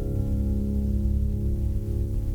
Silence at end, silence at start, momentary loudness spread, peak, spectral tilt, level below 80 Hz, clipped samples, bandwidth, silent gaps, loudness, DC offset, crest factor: 0 s; 0 s; 3 LU; -14 dBFS; -10 dB/octave; -26 dBFS; under 0.1%; 15 kHz; none; -27 LUFS; under 0.1%; 10 dB